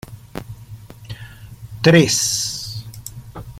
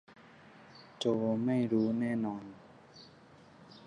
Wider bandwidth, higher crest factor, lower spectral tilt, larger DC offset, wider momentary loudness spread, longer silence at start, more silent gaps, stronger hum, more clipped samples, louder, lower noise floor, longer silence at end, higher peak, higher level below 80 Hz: first, 16 kHz vs 10 kHz; about the same, 20 dB vs 18 dB; second, -4 dB/octave vs -7 dB/octave; neither; about the same, 26 LU vs 24 LU; about the same, 0.1 s vs 0.1 s; neither; neither; neither; first, -16 LUFS vs -33 LUFS; second, -38 dBFS vs -58 dBFS; about the same, 0 s vs 0.05 s; first, -2 dBFS vs -18 dBFS; first, -46 dBFS vs -74 dBFS